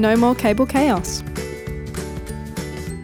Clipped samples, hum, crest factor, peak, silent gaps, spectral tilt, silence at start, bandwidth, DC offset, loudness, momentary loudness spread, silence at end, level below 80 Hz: under 0.1%; none; 16 dB; -4 dBFS; none; -5.5 dB/octave; 0 s; 19 kHz; under 0.1%; -21 LUFS; 14 LU; 0 s; -36 dBFS